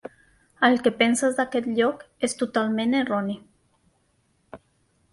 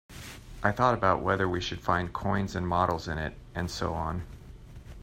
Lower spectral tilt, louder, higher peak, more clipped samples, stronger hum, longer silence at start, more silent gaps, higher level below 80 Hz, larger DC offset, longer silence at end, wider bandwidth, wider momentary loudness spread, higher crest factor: second, -4 dB/octave vs -6 dB/octave; first, -23 LUFS vs -29 LUFS; about the same, -6 dBFS vs -8 dBFS; neither; neither; first, 0.6 s vs 0.1 s; neither; second, -66 dBFS vs -46 dBFS; neither; first, 0.55 s vs 0 s; second, 11.5 kHz vs 16 kHz; second, 9 LU vs 20 LU; about the same, 20 dB vs 22 dB